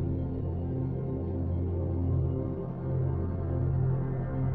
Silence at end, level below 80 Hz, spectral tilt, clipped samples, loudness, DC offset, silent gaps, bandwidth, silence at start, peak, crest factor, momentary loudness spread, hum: 0 s; -40 dBFS; -13.5 dB/octave; under 0.1%; -31 LUFS; under 0.1%; none; 2.8 kHz; 0 s; -18 dBFS; 12 dB; 4 LU; none